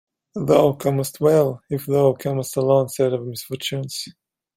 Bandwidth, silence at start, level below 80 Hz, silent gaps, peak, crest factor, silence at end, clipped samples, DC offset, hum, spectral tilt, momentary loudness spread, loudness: 16.5 kHz; 0.35 s; -60 dBFS; none; -2 dBFS; 18 dB; 0.45 s; under 0.1%; under 0.1%; none; -6 dB/octave; 13 LU; -21 LUFS